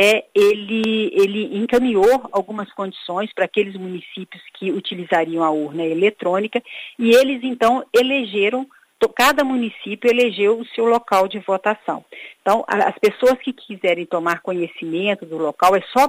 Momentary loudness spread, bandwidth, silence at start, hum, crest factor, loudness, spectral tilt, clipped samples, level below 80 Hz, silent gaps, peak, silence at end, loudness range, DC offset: 12 LU; 15.5 kHz; 0 s; none; 16 dB; -19 LUFS; -4.5 dB/octave; under 0.1%; -58 dBFS; none; -2 dBFS; 0 s; 4 LU; under 0.1%